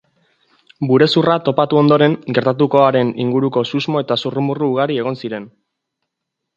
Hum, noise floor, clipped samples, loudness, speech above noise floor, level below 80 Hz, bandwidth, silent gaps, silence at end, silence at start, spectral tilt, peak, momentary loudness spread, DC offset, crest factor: none; -78 dBFS; under 0.1%; -16 LUFS; 63 dB; -62 dBFS; 8 kHz; none; 1.1 s; 0.8 s; -7.5 dB/octave; 0 dBFS; 9 LU; under 0.1%; 16 dB